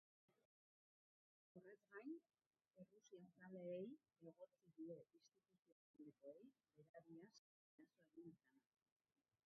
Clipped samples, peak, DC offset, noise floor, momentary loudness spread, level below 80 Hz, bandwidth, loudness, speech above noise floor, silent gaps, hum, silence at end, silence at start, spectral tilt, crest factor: under 0.1%; -44 dBFS; under 0.1%; under -90 dBFS; 14 LU; under -90 dBFS; 3.3 kHz; -62 LUFS; over 28 dB; 0.45-1.55 s, 2.46-2.51 s, 5.59-5.63 s, 5.72-5.94 s, 6.89-6.94 s, 7.38-7.78 s; none; 0.85 s; 0.3 s; -5.5 dB/octave; 20 dB